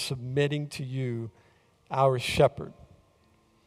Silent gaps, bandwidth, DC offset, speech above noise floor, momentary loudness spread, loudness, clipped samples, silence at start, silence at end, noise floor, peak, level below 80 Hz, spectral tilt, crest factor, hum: none; 15.5 kHz; under 0.1%; 37 dB; 17 LU; -28 LUFS; under 0.1%; 0 s; 0.85 s; -64 dBFS; -8 dBFS; -56 dBFS; -5.5 dB/octave; 22 dB; none